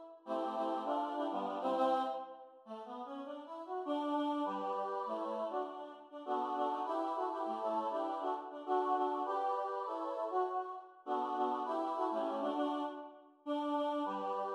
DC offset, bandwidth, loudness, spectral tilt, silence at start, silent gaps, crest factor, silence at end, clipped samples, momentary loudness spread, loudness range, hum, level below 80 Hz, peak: under 0.1%; 10.5 kHz; -38 LUFS; -5.5 dB/octave; 0 s; none; 16 dB; 0 s; under 0.1%; 11 LU; 2 LU; none; under -90 dBFS; -22 dBFS